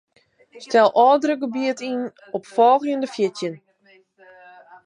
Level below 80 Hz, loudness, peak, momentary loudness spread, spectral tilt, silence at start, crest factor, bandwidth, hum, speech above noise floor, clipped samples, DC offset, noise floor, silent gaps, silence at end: -78 dBFS; -20 LUFS; -4 dBFS; 14 LU; -4.5 dB/octave; 0.55 s; 18 dB; 10.5 kHz; none; 37 dB; under 0.1%; under 0.1%; -56 dBFS; none; 1.3 s